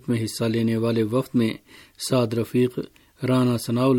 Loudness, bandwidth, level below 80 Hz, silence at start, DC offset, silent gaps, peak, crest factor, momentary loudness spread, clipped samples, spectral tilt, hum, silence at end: -23 LUFS; 17.5 kHz; -60 dBFS; 0.05 s; under 0.1%; none; -8 dBFS; 14 dB; 10 LU; under 0.1%; -6.5 dB/octave; none; 0 s